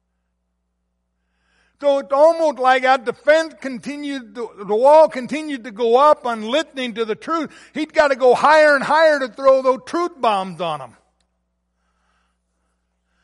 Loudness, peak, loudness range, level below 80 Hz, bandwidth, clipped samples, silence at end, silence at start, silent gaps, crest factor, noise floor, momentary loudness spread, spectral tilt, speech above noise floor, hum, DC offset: -17 LUFS; -2 dBFS; 6 LU; -62 dBFS; 11.5 kHz; under 0.1%; 2.4 s; 1.8 s; none; 16 dB; -72 dBFS; 16 LU; -4 dB/octave; 55 dB; none; under 0.1%